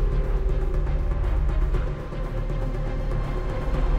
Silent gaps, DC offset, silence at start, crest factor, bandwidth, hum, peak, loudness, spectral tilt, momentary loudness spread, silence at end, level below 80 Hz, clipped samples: none; under 0.1%; 0 s; 12 dB; 5.6 kHz; none; -12 dBFS; -28 LUFS; -8 dB/octave; 4 LU; 0 s; -24 dBFS; under 0.1%